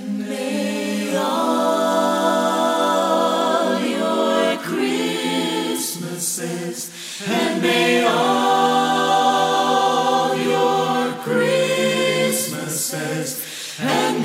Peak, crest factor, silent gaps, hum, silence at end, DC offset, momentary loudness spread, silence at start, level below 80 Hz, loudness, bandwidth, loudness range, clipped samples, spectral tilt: -4 dBFS; 14 dB; none; none; 0 s; under 0.1%; 8 LU; 0 s; -70 dBFS; -19 LUFS; 16 kHz; 4 LU; under 0.1%; -3.5 dB/octave